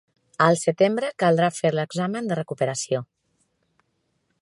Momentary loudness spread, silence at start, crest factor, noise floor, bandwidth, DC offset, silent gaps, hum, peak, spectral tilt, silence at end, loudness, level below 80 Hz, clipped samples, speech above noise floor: 8 LU; 0.4 s; 22 dB; -72 dBFS; 11.5 kHz; under 0.1%; none; none; -2 dBFS; -5 dB/octave; 1.4 s; -23 LUFS; -70 dBFS; under 0.1%; 50 dB